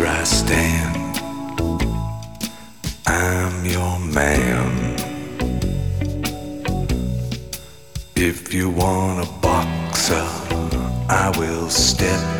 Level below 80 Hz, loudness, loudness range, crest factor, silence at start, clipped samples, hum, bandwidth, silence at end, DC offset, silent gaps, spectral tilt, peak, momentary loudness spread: -30 dBFS; -21 LUFS; 4 LU; 18 dB; 0 s; under 0.1%; none; 19.5 kHz; 0 s; 0.7%; none; -4 dB/octave; -2 dBFS; 11 LU